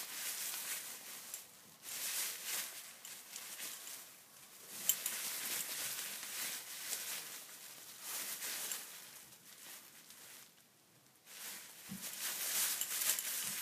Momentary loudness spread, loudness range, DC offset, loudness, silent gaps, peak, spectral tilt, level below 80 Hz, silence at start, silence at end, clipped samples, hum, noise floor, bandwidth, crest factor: 19 LU; 8 LU; under 0.1%; -40 LUFS; none; -12 dBFS; 1 dB/octave; under -90 dBFS; 0 s; 0 s; under 0.1%; none; -67 dBFS; 15.5 kHz; 32 dB